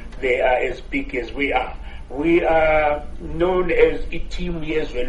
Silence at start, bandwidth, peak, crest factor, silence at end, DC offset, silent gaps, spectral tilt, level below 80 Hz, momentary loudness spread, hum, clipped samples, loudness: 0 s; 8.4 kHz; -2 dBFS; 18 dB; 0 s; under 0.1%; none; -6.5 dB/octave; -30 dBFS; 14 LU; none; under 0.1%; -20 LUFS